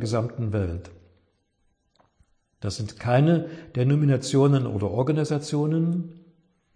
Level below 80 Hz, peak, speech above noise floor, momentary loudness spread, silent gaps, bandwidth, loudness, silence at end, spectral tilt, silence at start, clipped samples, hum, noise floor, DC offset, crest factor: -54 dBFS; -10 dBFS; 47 dB; 12 LU; none; 10 kHz; -24 LUFS; 0.6 s; -7.5 dB/octave; 0 s; under 0.1%; none; -70 dBFS; under 0.1%; 16 dB